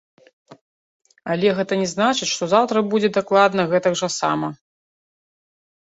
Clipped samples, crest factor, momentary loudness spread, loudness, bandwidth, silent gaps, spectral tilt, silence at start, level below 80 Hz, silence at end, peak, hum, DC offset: under 0.1%; 20 dB; 7 LU; -19 LUFS; 8.2 kHz; 0.61-1.00 s; -4 dB/octave; 0.5 s; -64 dBFS; 1.3 s; -2 dBFS; none; under 0.1%